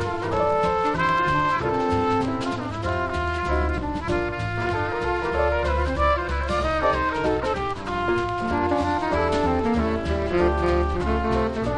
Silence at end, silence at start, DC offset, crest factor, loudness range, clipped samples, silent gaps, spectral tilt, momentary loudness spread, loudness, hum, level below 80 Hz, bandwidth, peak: 0 s; 0 s; under 0.1%; 16 dB; 2 LU; under 0.1%; none; -6.5 dB/octave; 5 LU; -23 LUFS; none; -32 dBFS; 10.5 kHz; -8 dBFS